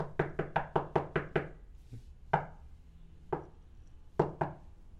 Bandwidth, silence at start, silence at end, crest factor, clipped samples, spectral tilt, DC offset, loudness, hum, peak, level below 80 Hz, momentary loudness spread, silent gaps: 8 kHz; 0 s; 0 s; 24 dB; under 0.1%; -8.5 dB/octave; under 0.1%; -36 LUFS; none; -14 dBFS; -54 dBFS; 20 LU; none